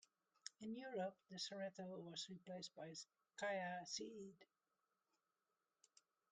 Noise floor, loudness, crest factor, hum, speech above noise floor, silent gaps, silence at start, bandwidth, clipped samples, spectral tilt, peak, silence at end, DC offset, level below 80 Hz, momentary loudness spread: under -90 dBFS; -51 LUFS; 22 dB; none; over 39 dB; none; 0.45 s; 9.4 kHz; under 0.1%; -3.5 dB/octave; -32 dBFS; 1.85 s; under 0.1%; under -90 dBFS; 12 LU